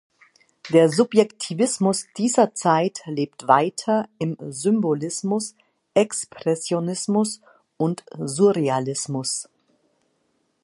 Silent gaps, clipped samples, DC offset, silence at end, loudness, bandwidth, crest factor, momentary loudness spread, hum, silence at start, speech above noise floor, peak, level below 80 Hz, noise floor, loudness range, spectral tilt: none; under 0.1%; under 0.1%; 1.2 s; -22 LUFS; 11.5 kHz; 20 dB; 10 LU; none; 0.65 s; 48 dB; -2 dBFS; -72 dBFS; -69 dBFS; 4 LU; -5 dB/octave